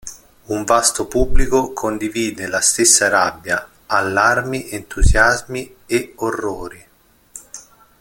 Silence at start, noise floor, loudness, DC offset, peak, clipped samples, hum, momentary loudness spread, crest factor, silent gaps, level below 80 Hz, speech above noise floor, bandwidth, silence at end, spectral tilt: 0.05 s; -54 dBFS; -17 LUFS; under 0.1%; 0 dBFS; under 0.1%; none; 22 LU; 18 dB; none; -26 dBFS; 38 dB; 17 kHz; 0.4 s; -3 dB/octave